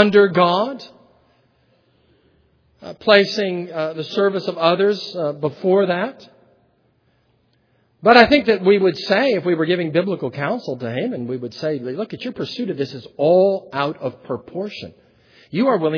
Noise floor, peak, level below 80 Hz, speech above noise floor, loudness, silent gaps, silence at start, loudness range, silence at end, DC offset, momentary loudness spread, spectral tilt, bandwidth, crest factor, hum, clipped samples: -62 dBFS; 0 dBFS; -58 dBFS; 43 dB; -19 LUFS; none; 0 s; 6 LU; 0 s; under 0.1%; 14 LU; -6.5 dB/octave; 5.4 kHz; 20 dB; none; under 0.1%